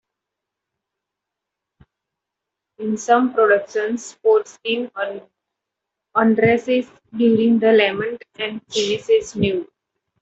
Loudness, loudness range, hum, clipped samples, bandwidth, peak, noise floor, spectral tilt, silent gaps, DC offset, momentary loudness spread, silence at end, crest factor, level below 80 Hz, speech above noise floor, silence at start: -19 LUFS; 4 LU; none; under 0.1%; 8 kHz; -2 dBFS; -83 dBFS; -5 dB/octave; none; under 0.1%; 12 LU; 0.6 s; 18 dB; -60 dBFS; 65 dB; 2.8 s